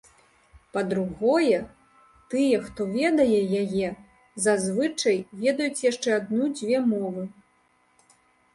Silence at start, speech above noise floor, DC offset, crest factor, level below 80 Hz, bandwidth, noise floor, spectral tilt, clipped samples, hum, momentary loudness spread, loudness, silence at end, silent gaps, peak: 0.55 s; 41 dB; under 0.1%; 16 dB; -60 dBFS; 11.5 kHz; -65 dBFS; -5 dB/octave; under 0.1%; none; 11 LU; -25 LUFS; 1.25 s; none; -8 dBFS